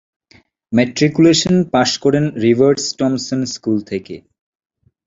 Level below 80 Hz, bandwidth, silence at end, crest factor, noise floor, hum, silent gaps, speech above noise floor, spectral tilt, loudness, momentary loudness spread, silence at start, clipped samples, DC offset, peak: -52 dBFS; 7.8 kHz; 0.9 s; 16 dB; -52 dBFS; none; none; 37 dB; -5 dB/octave; -15 LUFS; 11 LU; 0.7 s; under 0.1%; under 0.1%; -2 dBFS